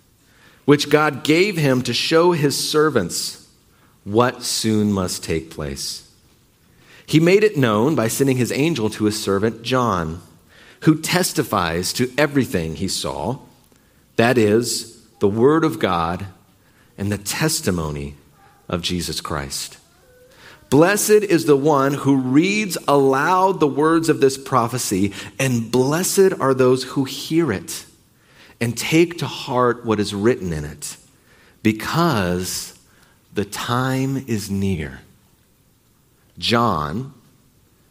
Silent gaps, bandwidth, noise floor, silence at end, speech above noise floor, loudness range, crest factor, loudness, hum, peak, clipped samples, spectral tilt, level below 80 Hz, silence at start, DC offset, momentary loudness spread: none; 16 kHz; -57 dBFS; 0.8 s; 39 dB; 7 LU; 20 dB; -19 LUFS; none; 0 dBFS; under 0.1%; -5 dB/octave; -48 dBFS; 0.65 s; under 0.1%; 12 LU